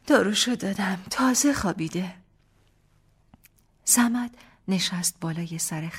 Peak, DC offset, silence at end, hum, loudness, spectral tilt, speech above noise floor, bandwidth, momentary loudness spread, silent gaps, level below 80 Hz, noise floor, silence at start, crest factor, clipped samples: -6 dBFS; under 0.1%; 0 s; 50 Hz at -65 dBFS; -24 LUFS; -3 dB/octave; 37 dB; 16.5 kHz; 12 LU; none; -56 dBFS; -62 dBFS; 0.05 s; 20 dB; under 0.1%